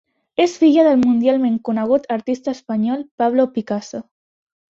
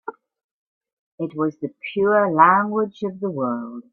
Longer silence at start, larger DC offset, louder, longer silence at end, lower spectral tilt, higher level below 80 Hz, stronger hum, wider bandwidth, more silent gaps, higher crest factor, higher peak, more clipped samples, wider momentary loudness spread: first, 0.4 s vs 0.05 s; neither; about the same, -18 LUFS vs -20 LUFS; first, 0.7 s vs 0.1 s; second, -6 dB/octave vs -8.5 dB/octave; first, -60 dBFS vs -68 dBFS; neither; first, 7.6 kHz vs 6.4 kHz; second, 3.11-3.18 s vs 0.44-0.81 s, 0.93-1.18 s; second, 14 dB vs 20 dB; about the same, -2 dBFS vs -2 dBFS; neither; second, 12 LU vs 16 LU